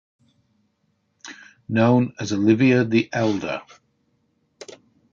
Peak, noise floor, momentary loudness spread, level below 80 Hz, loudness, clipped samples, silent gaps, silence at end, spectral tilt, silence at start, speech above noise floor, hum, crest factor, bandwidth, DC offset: -4 dBFS; -69 dBFS; 25 LU; -60 dBFS; -20 LUFS; under 0.1%; none; 0.5 s; -6.5 dB/octave; 1.25 s; 50 dB; none; 20 dB; 7.6 kHz; under 0.1%